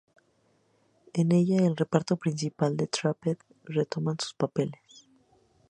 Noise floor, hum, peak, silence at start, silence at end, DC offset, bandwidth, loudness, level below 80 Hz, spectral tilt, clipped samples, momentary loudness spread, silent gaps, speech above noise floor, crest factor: -68 dBFS; none; -6 dBFS; 1.15 s; 0.95 s; under 0.1%; 9.8 kHz; -28 LUFS; -70 dBFS; -6.5 dB/octave; under 0.1%; 9 LU; none; 41 dB; 24 dB